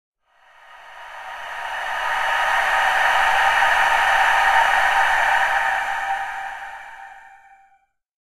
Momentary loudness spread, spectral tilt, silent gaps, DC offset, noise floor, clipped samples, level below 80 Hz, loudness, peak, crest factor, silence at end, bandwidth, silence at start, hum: 19 LU; 0.5 dB/octave; none; under 0.1%; -61 dBFS; under 0.1%; -48 dBFS; -18 LUFS; -4 dBFS; 18 dB; 1.1 s; 15.5 kHz; 0.7 s; none